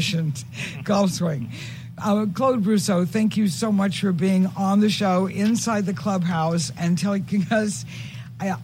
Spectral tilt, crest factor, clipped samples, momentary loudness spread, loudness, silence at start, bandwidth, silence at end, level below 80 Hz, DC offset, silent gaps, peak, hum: -5.5 dB/octave; 14 dB; under 0.1%; 10 LU; -22 LUFS; 0 s; 16 kHz; 0 s; -58 dBFS; under 0.1%; none; -8 dBFS; none